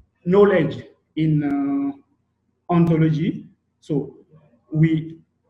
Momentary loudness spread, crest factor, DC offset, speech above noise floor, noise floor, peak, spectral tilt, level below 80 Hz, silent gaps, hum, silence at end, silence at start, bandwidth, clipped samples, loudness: 17 LU; 18 dB; under 0.1%; 51 dB; -70 dBFS; -2 dBFS; -10 dB/octave; -56 dBFS; none; none; 0.35 s; 0.25 s; 5.6 kHz; under 0.1%; -20 LUFS